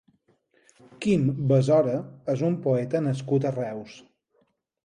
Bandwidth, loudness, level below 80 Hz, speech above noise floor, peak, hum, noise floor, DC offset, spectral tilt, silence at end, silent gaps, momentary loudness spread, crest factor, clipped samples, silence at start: 10 kHz; -25 LUFS; -64 dBFS; 45 dB; -10 dBFS; none; -69 dBFS; under 0.1%; -8 dB/octave; 0.85 s; none; 11 LU; 16 dB; under 0.1%; 1 s